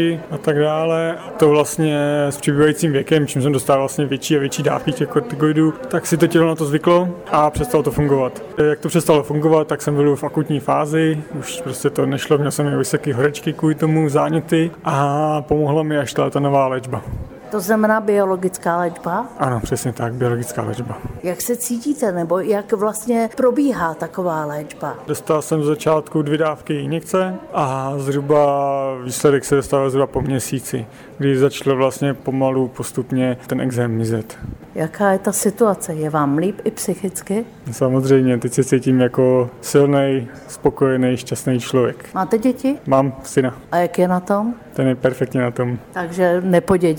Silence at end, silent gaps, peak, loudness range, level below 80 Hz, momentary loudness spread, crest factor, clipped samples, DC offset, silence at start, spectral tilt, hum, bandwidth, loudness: 0 s; none; -2 dBFS; 3 LU; -46 dBFS; 8 LU; 16 dB; under 0.1%; under 0.1%; 0 s; -6 dB/octave; none; over 20 kHz; -18 LUFS